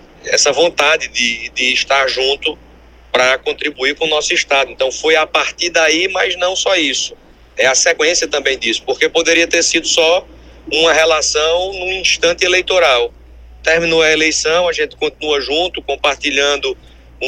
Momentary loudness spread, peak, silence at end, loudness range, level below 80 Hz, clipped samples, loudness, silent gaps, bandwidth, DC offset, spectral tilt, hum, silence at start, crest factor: 8 LU; 0 dBFS; 0 s; 2 LU; -42 dBFS; under 0.1%; -13 LUFS; none; 13.5 kHz; under 0.1%; -0.5 dB/octave; none; 0.25 s; 14 dB